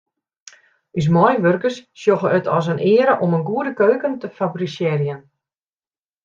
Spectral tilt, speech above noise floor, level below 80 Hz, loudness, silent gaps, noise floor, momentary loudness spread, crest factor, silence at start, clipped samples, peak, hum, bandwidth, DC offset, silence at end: -7.5 dB/octave; over 72 dB; -60 dBFS; -18 LUFS; none; under -90 dBFS; 10 LU; 18 dB; 0.95 s; under 0.1%; -2 dBFS; none; 7.6 kHz; under 0.1%; 1.05 s